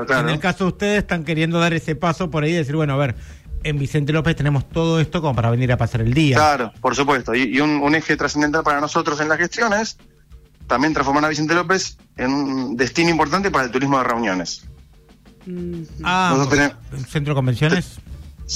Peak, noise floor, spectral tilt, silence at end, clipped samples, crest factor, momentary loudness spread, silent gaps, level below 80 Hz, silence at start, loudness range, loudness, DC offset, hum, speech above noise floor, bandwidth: -6 dBFS; -48 dBFS; -5.5 dB/octave; 0 s; under 0.1%; 14 dB; 9 LU; none; -40 dBFS; 0 s; 3 LU; -19 LUFS; under 0.1%; none; 29 dB; 14.5 kHz